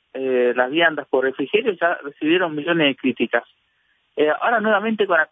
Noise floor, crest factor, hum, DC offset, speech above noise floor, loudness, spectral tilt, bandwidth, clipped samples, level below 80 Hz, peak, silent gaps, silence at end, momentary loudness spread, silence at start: -65 dBFS; 16 dB; none; under 0.1%; 46 dB; -20 LUFS; -8 dB/octave; 3.9 kHz; under 0.1%; -74 dBFS; -4 dBFS; none; 0.05 s; 5 LU; 0.15 s